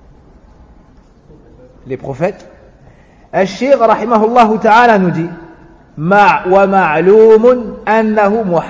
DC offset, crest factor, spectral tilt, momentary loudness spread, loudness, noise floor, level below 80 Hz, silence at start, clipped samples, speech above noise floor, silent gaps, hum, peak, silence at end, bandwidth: under 0.1%; 12 dB; -7 dB/octave; 13 LU; -10 LUFS; -43 dBFS; -44 dBFS; 1.85 s; 0.2%; 34 dB; none; none; 0 dBFS; 0 s; 8 kHz